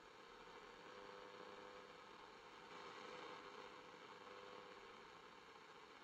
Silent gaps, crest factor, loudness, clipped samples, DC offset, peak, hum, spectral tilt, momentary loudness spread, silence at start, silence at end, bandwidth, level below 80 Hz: none; 16 dB; -59 LUFS; under 0.1%; under 0.1%; -42 dBFS; none; -3 dB/octave; 6 LU; 0 s; 0 s; 10 kHz; -86 dBFS